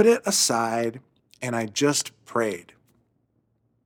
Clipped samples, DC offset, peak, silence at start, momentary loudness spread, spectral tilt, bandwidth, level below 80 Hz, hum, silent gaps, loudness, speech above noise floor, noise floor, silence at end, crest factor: under 0.1%; under 0.1%; -6 dBFS; 0 s; 11 LU; -3 dB/octave; 17.5 kHz; -74 dBFS; none; none; -24 LUFS; 47 dB; -70 dBFS; 1.25 s; 20 dB